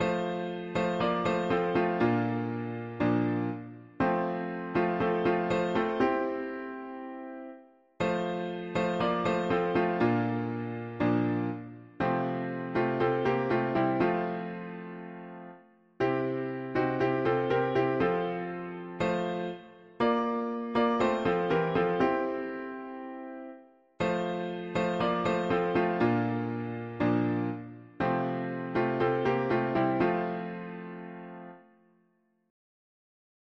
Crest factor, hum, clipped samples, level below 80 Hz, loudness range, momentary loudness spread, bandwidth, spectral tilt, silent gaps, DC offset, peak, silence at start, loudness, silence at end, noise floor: 16 dB; none; under 0.1%; -60 dBFS; 3 LU; 14 LU; 7.4 kHz; -7.5 dB/octave; none; under 0.1%; -14 dBFS; 0 s; -30 LUFS; 1.85 s; -71 dBFS